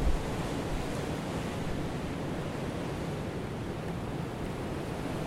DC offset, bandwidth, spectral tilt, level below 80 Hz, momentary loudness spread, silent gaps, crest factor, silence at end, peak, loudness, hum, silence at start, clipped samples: under 0.1%; 16 kHz; -6 dB/octave; -40 dBFS; 2 LU; none; 18 dB; 0 s; -16 dBFS; -36 LUFS; none; 0 s; under 0.1%